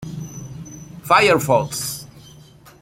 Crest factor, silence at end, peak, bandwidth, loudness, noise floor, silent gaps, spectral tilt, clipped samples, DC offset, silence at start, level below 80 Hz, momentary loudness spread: 20 dB; 0.5 s; -2 dBFS; 16.5 kHz; -17 LUFS; -46 dBFS; none; -4 dB/octave; under 0.1%; under 0.1%; 0 s; -52 dBFS; 22 LU